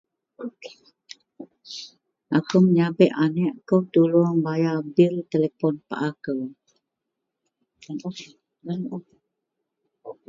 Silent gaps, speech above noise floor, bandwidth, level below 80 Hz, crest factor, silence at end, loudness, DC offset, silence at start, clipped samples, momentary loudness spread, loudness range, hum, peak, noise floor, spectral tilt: none; 60 dB; 7.4 kHz; -72 dBFS; 22 dB; 0.15 s; -22 LUFS; under 0.1%; 0.4 s; under 0.1%; 21 LU; 17 LU; none; -4 dBFS; -82 dBFS; -8 dB/octave